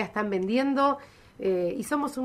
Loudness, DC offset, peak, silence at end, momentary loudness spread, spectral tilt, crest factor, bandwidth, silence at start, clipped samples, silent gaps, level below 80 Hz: -27 LUFS; under 0.1%; -10 dBFS; 0 s; 6 LU; -5.5 dB/octave; 16 dB; 15.5 kHz; 0 s; under 0.1%; none; -62 dBFS